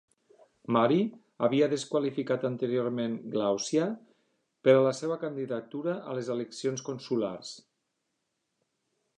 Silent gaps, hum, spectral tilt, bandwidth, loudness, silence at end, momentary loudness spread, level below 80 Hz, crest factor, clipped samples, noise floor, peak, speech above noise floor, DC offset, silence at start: none; none; -5.5 dB/octave; 10.5 kHz; -29 LUFS; 1.6 s; 11 LU; -80 dBFS; 20 dB; under 0.1%; -81 dBFS; -10 dBFS; 52 dB; under 0.1%; 0.7 s